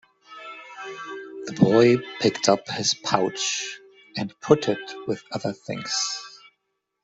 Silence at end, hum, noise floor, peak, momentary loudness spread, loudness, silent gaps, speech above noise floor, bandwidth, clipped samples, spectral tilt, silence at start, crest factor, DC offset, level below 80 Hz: 0.65 s; none; -77 dBFS; -2 dBFS; 18 LU; -23 LUFS; none; 53 dB; 8.2 kHz; under 0.1%; -4 dB/octave; 0.3 s; 22 dB; under 0.1%; -64 dBFS